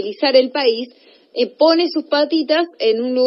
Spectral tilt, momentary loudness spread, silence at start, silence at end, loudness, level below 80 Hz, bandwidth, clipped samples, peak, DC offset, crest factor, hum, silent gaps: -6.5 dB/octave; 9 LU; 0 s; 0 s; -16 LUFS; -86 dBFS; 5.8 kHz; under 0.1%; 0 dBFS; under 0.1%; 16 dB; none; none